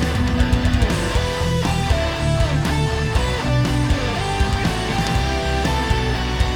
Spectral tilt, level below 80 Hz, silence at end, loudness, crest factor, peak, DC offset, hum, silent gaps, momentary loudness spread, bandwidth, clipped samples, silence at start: -5.5 dB/octave; -24 dBFS; 0 s; -20 LUFS; 14 dB; -4 dBFS; under 0.1%; none; none; 2 LU; 17 kHz; under 0.1%; 0 s